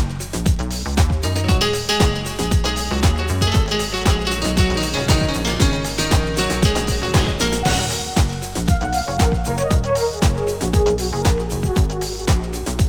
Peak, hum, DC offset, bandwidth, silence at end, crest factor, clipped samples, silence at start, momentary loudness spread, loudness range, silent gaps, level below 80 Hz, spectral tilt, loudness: -2 dBFS; none; under 0.1%; over 20 kHz; 0 s; 16 dB; under 0.1%; 0 s; 4 LU; 1 LU; none; -24 dBFS; -4.5 dB/octave; -19 LUFS